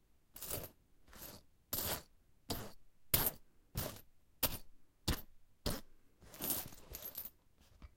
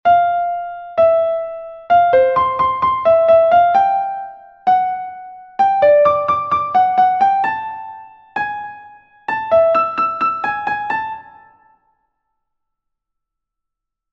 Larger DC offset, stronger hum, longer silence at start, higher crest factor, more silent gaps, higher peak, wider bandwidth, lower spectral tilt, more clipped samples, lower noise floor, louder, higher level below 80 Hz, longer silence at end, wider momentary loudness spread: neither; neither; first, 0.35 s vs 0.05 s; first, 30 dB vs 14 dB; neither; second, -14 dBFS vs -2 dBFS; first, 16.5 kHz vs 6 kHz; second, -3 dB/octave vs -6 dB/octave; neither; second, -67 dBFS vs -80 dBFS; second, -41 LUFS vs -15 LUFS; about the same, -54 dBFS vs -54 dBFS; second, 0.1 s vs 2.9 s; about the same, 19 LU vs 17 LU